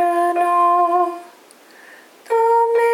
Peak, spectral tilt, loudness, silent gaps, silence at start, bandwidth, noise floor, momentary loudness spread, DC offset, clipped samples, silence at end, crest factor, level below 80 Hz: -6 dBFS; -2.5 dB/octave; -17 LUFS; none; 0 s; 16 kHz; -46 dBFS; 8 LU; under 0.1%; under 0.1%; 0 s; 12 dB; under -90 dBFS